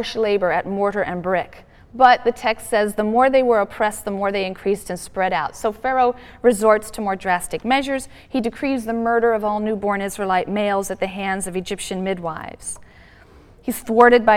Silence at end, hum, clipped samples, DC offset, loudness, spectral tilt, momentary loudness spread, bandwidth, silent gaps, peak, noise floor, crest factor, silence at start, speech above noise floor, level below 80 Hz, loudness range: 0 s; none; under 0.1%; under 0.1%; -20 LUFS; -4.5 dB/octave; 11 LU; 16.5 kHz; none; 0 dBFS; -47 dBFS; 18 dB; 0 s; 28 dB; -48 dBFS; 5 LU